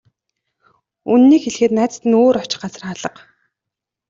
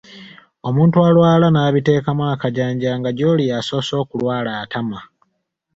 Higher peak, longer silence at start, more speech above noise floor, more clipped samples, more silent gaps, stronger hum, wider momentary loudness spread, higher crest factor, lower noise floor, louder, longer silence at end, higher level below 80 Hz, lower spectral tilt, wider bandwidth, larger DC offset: about the same, -4 dBFS vs -2 dBFS; first, 1.05 s vs 0.1 s; first, 69 dB vs 55 dB; neither; neither; neither; first, 17 LU vs 12 LU; about the same, 14 dB vs 16 dB; first, -84 dBFS vs -71 dBFS; about the same, -15 LUFS vs -17 LUFS; first, 1 s vs 0.7 s; second, -60 dBFS vs -52 dBFS; second, -5 dB/octave vs -7.5 dB/octave; about the same, 7.8 kHz vs 7.8 kHz; neither